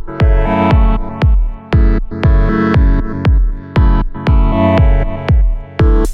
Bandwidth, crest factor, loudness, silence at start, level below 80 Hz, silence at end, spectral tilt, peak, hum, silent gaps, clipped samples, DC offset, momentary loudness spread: 5.4 kHz; 10 dB; -13 LUFS; 0 s; -12 dBFS; 0 s; -8.5 dB/octave; 0 dBFS; none; none; under 0.1%; under 0.1%; 5 LU